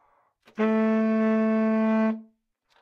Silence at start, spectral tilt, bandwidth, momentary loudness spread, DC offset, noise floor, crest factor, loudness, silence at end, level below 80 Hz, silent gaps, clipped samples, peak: 0.6 s; -9 dB/octave; 5.2 kHz; 6 LU; under 0.1%; -68 dBFS; 10 dB; -24 LUFS; 0.6 s; -86 dBFS; none; under 0.1%; -14 dBFS